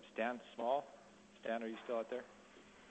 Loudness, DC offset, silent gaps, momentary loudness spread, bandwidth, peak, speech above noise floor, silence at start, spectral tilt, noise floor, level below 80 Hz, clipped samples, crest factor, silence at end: -42 LUFS; under 0.1%; none; 21 LU; 8.2 kHz; -24 dBFS; 20 dB; 0 s; -4.5 dB/octave; -62 dBFS; -82 dBFS; under 0.1%; 20 dB; 0 s